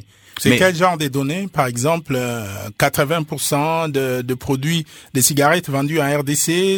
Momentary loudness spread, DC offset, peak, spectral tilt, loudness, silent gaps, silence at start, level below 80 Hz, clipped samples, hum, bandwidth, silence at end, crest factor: 8 LU; under 0.1%; 0 dBFS; -4 dB/octave; -18 LUFS; none; 0.35 s; -52 dBFS; under 0.1%; none; 19 kHz; 0 s; 18 dB